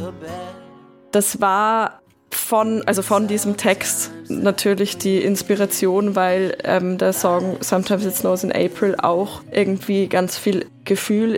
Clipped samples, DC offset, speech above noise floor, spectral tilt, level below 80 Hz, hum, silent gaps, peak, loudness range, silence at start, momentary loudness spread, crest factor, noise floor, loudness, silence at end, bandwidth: under 0.1%; under 0.1%; 26 dB; -4.5 dB/octave; -60 dBFS; none; none; -2 dBFS; 1 LU; 0 s; 5 LU; 16 dB; -45 dBFS; -19 LUFS; 0 s; 17 kHz